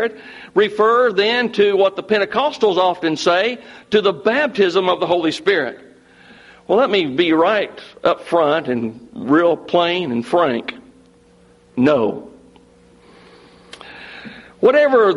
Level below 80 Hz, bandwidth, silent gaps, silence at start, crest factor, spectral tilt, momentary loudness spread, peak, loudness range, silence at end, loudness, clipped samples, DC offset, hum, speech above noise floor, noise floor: -60 dBFS; 11.5 kHz; none; 0 s; 16 dB; -5 dB/octave; 16 LU; -2 dBFS; 6 LU; 0 s; -17 LUFS; under 0.1%; under 0.1%; none; 34 dB; -50 dBFS